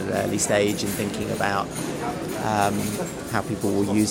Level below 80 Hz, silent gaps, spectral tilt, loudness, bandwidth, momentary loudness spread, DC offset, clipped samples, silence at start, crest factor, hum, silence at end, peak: -50 dBFS; none; -4.5 dB/octave; -25 LUFS; 17.5 kHz; 7 LU; under 0.1%; under 0.1%; 0 s; 20 dB; none; 0 s; -4 dBFS